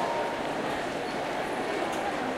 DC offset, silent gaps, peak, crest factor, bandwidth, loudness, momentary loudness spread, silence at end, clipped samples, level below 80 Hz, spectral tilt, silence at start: under 0.1%; none; -18 dBFS; 14 dB; 16 kHz; -31 LUFS; 2 LU; 0 s; under 0.1%; -58 dBFS; -4 dB/octave; 0 s